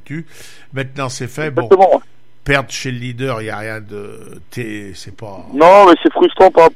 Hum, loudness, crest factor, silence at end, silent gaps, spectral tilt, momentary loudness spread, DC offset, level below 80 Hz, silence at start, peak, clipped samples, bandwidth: none; -12 LUFS; 14 dB; 0.05 s; none; -5.5 dB/octave; 23 LU; 2%; -44 dBFS; 0.1 s; 0 dBFS; under 0.1%; 15 kHz